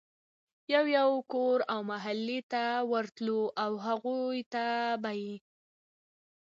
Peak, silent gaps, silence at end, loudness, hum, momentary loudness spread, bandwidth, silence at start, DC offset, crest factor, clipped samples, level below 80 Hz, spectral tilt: -14 dBFS; 2.43-2.50 s, 4.46-4.51 s; 1.1 s; -32 LUFS; none; 8 LU; 7.6 kHz; 0.7 s; under 0.1%; 18 dB; under 0.1%; -86 dBFS; -5.5 dB/octave